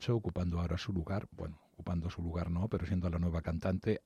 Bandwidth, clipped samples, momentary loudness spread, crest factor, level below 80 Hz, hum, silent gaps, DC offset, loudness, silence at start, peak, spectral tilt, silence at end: 8.6 kHz; under 0.1%; 8 LU; 16 dB; -52 dBFS; none; none; under 0.1%; -37 LUFS; 0 s; -20 dBFS; -8 dB/octave; 0.05 s